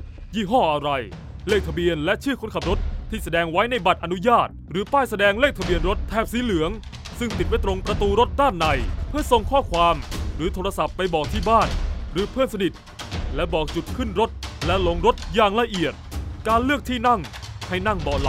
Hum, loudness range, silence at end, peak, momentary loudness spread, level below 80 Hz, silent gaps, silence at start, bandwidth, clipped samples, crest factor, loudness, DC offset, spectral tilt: none; 3 LU; 0 s; -4 dBFS; 10 LU; -32 dBFS; none; 0 s; 16 kHz; under 0.1%; 20 dB; -22 LUFS; under 0.1%; -5.5 dB/octave